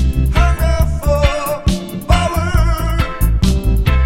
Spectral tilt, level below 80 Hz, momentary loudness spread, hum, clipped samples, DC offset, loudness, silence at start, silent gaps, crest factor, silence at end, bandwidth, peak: -6 dB/octave; -16 dBFS; 4 LU; none; under 0.1%; under 0.1%; -16 LUFS; 0 s; none; 14 dB; 0 s; 16.5 kHz; 0 dBFS